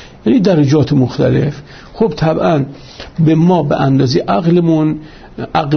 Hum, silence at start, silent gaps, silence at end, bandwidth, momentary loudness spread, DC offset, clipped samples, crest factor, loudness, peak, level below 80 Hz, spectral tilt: none; 0 s; none; 0 s; 6.6 kHz; 14 LU; under 0.1%; under 0.1%; 12 dB; -13 LUFS; 0 dBFS; -40 dBFS; -8 dB/octave